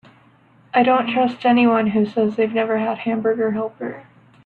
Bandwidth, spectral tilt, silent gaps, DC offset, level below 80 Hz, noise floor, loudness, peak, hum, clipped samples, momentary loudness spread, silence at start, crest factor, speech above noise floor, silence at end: 4.7 kHz; -8 dB/octave; none; under 0.1%; -64 dBFS; -53 dBFS; -19 LUFS; -4 dBFS; none; under 0.1%; 11 LU; 0.75 s; 16 dB; 34 dB; 0.45 s